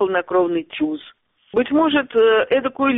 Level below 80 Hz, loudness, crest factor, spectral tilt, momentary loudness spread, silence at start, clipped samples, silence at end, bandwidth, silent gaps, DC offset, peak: -58 dBFS; -18 LUFS; 12 dB; -2.5 dB/octave; 9 LU; 0 s; under 0.1%; 0 s; 4 kHz; none; under 0.1%; -6 dBFS